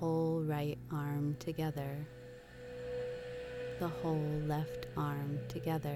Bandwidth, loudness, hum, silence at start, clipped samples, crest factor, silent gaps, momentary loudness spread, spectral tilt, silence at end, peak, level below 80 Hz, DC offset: 15.5 kHz; -39 LUFS; none; 0 s; under 0.1%; 14 dB; none; 11 LU; -7.5 dB/octave; 0 s; -24 dBFS; -60 dBFS; under 0.1%